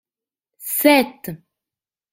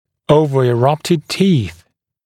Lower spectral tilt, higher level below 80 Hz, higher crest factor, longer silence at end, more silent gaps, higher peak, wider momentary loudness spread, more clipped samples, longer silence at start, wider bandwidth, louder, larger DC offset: second, -3 dB/octave vs -6.5 dB/octave; second, -64 dBFS vs -48 dBFS; first, 22 dB vs 16 dB; first, 0.75 s vs 0.5 s; neither; about the same, 0 dBFS vs 0 dBFS; first, 20 LU vs 5 LU; neither; first, 0.6 s vs 0.3 s; about the same, 16 kHz vs 15.5 kHz; about the same, -17 LUFS vs -15 LUFS; neither